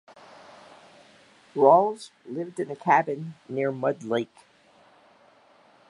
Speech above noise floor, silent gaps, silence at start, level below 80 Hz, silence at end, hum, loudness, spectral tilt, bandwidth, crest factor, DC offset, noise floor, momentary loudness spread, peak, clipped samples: 34 dB; none; 1.55 s; -80 dBFS; 1.65 s; none; -25 LUFS; -6.5 dB/octave; 11.5 kHz; 22 dB; under 0.1%; -58 dBFS; 18 LU; -4 dBFS; under 0.1%